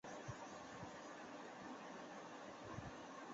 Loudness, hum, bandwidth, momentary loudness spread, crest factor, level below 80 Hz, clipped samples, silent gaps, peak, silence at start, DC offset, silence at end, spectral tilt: -54 LUFS; none; 7.6 kHz; 2 LU; 16 dB; -74 dBFS; under 0.1%; none; -36 dBFS; 0.05 s; under 0.1%; 0 s; -4 dB/octave